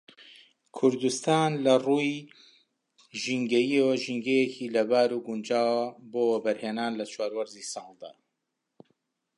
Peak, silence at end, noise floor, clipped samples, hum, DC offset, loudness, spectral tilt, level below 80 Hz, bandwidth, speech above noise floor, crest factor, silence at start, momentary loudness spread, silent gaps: -10 dBFS; 1.25 s; -82 dBFS; under 0.1%; none; under 0.1%; -27 LUFS; -4.5 dB/octave; -82 dBFS; 11.5 kHz; 56 dB; 18 dB; 0.2 s; 14 LU; none